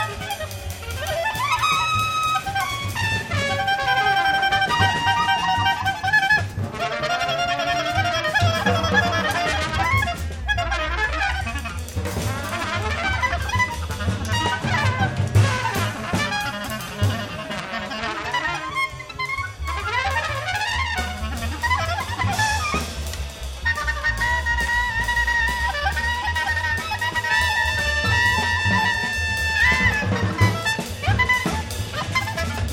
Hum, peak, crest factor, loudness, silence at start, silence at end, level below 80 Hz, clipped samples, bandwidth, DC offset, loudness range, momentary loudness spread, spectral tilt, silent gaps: none; -4 dBFS; 18 dB; -21 LUFS; 0 s; 0 s; -34 dBFS; under 0.1%; 17 kHz; under 0.1%; 5 LU; 9 LU; -4 dB/octave; none